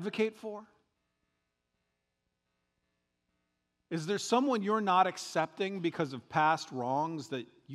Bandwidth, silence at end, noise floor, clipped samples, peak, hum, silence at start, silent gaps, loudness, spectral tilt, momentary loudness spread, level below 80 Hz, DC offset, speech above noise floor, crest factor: 14 kHz; 0 s; -84 dBFS; under 0.1%; -14 dBFS; 60 Hz at -75 dBFS; 0 s; none; -32 LUFS; -5 dB/octave; 13 LU; -84 dBFS; under 0.1%; 51 dB; 22 dB